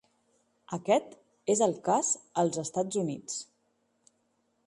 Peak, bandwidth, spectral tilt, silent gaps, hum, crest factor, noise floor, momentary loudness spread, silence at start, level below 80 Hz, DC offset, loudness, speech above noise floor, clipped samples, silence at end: -12 dBFS; 11.5 kHz; -4 dB/octave; none; none; 20 dB; -74 dBFS; 11 LU; 0.7 s; -76 dBFS; under 0.1%; -30 LUFS; 45 dB; under 0.1%; 1.25 s